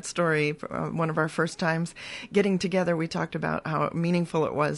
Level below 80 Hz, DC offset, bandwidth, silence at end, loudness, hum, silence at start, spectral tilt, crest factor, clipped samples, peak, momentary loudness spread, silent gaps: -60 dBFS; under 0.1%; 11.5 kHz; 0 s; -27 LUFS; none; 0.05 s; -6 dB/octave; 18 dB; under 0.1%; -8 dBFS; 6 LU; none